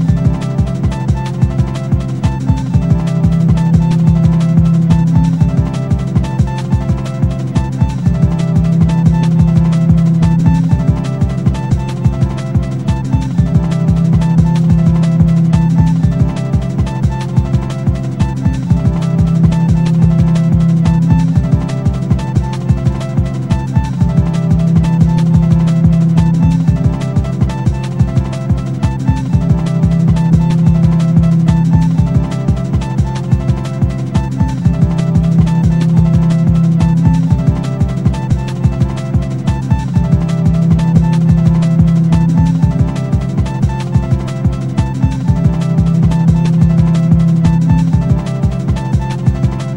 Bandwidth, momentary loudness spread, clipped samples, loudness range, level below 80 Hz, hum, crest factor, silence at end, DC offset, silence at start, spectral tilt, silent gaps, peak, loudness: 9 kHz; 6 LU; under 0.1%; 3 LU; -22 dBFS; none; 12 dB; 0 s; 1%; 0 s; -8.5 dB/octave; none; 0 dBFS; -12 LUFS